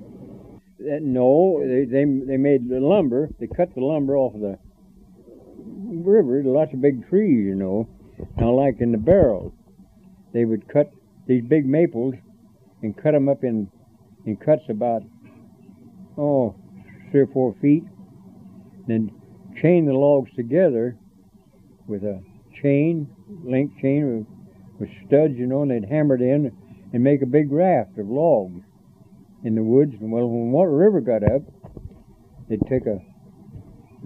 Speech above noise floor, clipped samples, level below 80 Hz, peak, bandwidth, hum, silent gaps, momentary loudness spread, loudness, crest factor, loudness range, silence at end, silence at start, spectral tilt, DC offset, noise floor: 33 dB; under 0.1%; -48 dBFS; -2 dBFS; 3.9 kHz; none; none; 16 LU; -21 LUFS; 20 dB; 4 LU; 0 s; 0 s; -11 dB/octave; under 0.1%; -53 dBFS